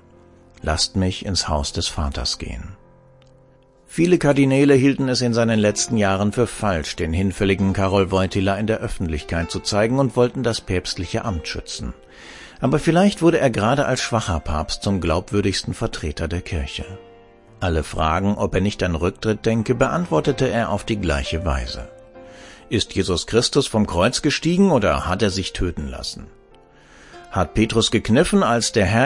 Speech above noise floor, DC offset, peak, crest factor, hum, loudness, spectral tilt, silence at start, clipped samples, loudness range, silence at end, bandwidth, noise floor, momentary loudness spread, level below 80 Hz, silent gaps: 33 dB; under 0.1%; -2 dBFS; 18 dB; none; -20 LUFS; -5 dB/octave; 0.65 s; under 0.1%; 5 LU; 0 s; 11.5 kHz; -52 dBFS; 12 LU; -36 dBFS; none